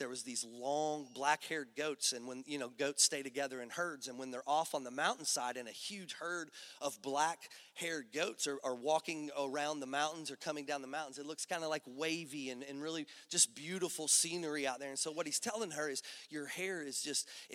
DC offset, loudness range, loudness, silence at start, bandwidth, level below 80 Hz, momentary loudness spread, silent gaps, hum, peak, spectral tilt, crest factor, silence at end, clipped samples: under 0.1%; 5 LU; -38 LUFS; 0 s; 16 kHz; under -90 dBFS; 13 LU; none; none; -16 dBFS; -1.5 dB/octave; 24 dB; 0 s; under 0.1%